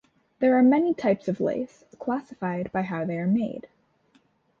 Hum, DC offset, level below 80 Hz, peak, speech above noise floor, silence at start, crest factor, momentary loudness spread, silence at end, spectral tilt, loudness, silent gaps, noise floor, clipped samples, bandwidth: none; under 0.1%; -64 dBFS; -10 dBFS; 40 dB; 0.4 s; 16 dB; 13 LU; 1 s; -9 dB/octave; -25 LUFS; none; -64 dBFS; under 0.1%; 7 kHz